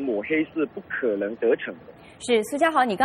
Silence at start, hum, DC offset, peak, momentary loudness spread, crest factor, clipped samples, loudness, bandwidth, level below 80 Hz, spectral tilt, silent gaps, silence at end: 0 s; none; under 0.1%; -6 dBFS; 12 LU; 18 dB; under 0.1%; -24 LUFS; 14.5 kHz; -64 dBFS; -4.5 dB/octave; none; 0 s